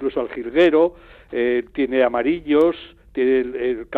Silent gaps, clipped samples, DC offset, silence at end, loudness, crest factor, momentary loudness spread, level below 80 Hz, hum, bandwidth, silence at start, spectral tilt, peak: none; under 0.1%; under 0.1%; 0 s; -20 LUFS; 14 dB; 10 LU; -50 dBFS; none; 4.8 kHz; 0 s; -7 dB/octave; -6 dBFS